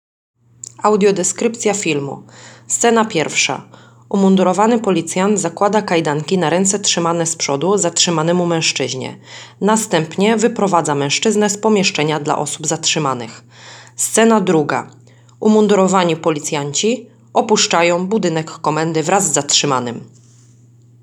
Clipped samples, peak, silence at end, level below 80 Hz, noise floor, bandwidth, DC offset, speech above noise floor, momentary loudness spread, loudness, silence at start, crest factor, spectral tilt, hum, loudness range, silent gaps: under 0.1%; 0 dBFS; 0.95 s; -66 dBFS; -46 dBFS; 19.5 kHz; under 0.1%; 31 dB; 9 LU; -15 LUFS; 0.8 s; 16 dB; -3.5 dB/octave; none; 2 LU; none